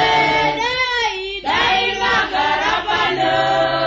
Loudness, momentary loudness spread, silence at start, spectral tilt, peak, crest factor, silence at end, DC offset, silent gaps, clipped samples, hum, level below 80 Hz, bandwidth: -16 LUFS; 4 LU; 0 s; -3 dB/octave; -4 dBFS; 12 dB; 0 s; under 0.1%; none; under 0.1%; none; -44 dBFS; 8 kHz